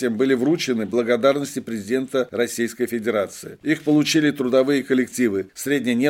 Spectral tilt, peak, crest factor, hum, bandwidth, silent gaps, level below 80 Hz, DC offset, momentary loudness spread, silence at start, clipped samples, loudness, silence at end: -4.5 dB/octave; -4 dBFS; 16 dB; none; 17 kHz; none; -66 dBFS; under 0.1%; 7 LU; 0 s; under 0.1%; -21 LUFS; 0 s